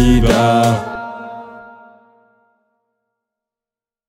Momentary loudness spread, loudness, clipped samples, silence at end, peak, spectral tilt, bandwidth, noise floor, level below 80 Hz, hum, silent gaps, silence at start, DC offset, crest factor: 23 LU; -14 LUFS; under 0.1%; 2.45 s; 0 dBFS; -6 dB/octave; 16 kHz; under -90 dBFS; -26 dBFS; none; none; 0 s; under 0.1%; 18 dB